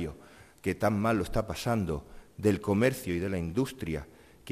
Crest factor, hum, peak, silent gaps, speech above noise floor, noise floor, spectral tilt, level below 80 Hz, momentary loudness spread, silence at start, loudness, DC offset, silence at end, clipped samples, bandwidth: 20 dB; none; -12 dBFS; none; 25 dB; -54 dBFS; -6.5 dB/octave; -48 dBFS; 12 LU; 0 s; -31 LUFS; under 0.1%; 0 s; under 0.1%; 14.5 kHz